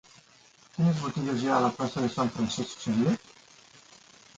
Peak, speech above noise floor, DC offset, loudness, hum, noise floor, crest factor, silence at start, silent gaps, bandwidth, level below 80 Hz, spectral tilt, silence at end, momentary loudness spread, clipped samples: -12 dBFS; 31 dB; under 0.1%; -28 LUFS; none; -58 dBFS; 18 dB; 0.75 s; none; 9.4 kHz; -62 dBFS; -6 dB/octave; 1.2 s; 6 LU; under 0.1%